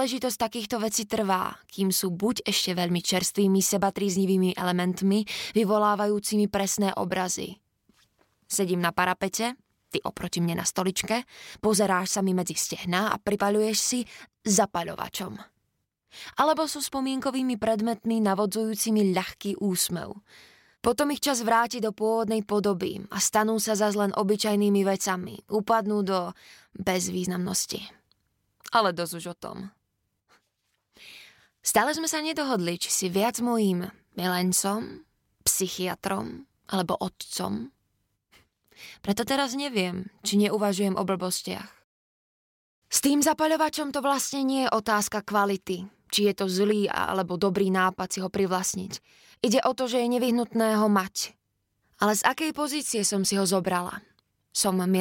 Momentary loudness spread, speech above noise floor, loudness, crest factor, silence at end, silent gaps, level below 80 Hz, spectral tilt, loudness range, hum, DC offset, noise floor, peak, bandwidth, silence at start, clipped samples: 9 LU; 51 dB; -26 LUFS; 20 dB; 0 s; 41.84-42.82 s; -62 dBFS; -4 dB/octave; 5 LU; none; under 0.1%; -78 dBFS; -8 dBFS; 17 kHz; 0 s; under 0.1%